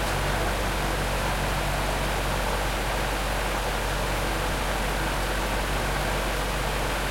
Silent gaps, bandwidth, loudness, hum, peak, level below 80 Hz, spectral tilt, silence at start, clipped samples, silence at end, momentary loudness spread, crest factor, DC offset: none; 16.5 kHz; -27 LUFS; none; -14 dBFS; -30 dBFS; -4 dB/octave; 0 s; under 0.1%; 0 s; 1 LU; 12 dB; under 0.1%